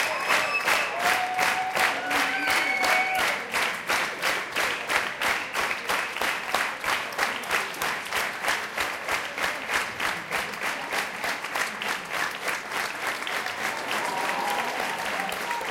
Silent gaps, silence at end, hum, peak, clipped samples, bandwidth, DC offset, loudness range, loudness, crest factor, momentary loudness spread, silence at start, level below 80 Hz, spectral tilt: none; 0 s; none; -6 dBFS; under 0.1%; 17 kHz; under 0.1%; 5 LU; -26 LUFS; 20 dB; 6 LU; 0 s; -62 dBFS; -1 dB/octave